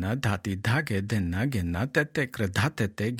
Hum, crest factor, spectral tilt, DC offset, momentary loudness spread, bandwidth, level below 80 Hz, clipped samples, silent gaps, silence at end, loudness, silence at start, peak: none; 18 dB; -6 dB/octave; under 0.1%; 3 LU; 16.5 kHz; -54 dBFS; under 0.1%; none; 0 s; -28 LUFS; 0 s; -10 dBFS